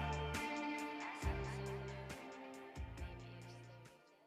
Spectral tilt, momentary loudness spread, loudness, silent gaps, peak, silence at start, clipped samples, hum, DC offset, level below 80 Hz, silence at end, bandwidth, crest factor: -5.5 dB/octave; 14 LU; -46 LUFS; none; -30 dBFS; 0 s; under 0.1%; none; under 0.1%; -54 dBFS; 0 s; 15.5 kHz; 16 dB